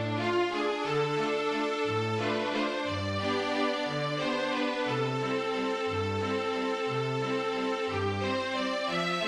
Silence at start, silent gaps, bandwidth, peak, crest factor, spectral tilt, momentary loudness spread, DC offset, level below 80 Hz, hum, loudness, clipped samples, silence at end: 0 s; none; 12 kHz; -18 dBFS; 12 dB; -5.5 dB/octave; 2 LU; under 0.1%; -68 dBFS; none; -30 LUFS; under 0.1%; 0 s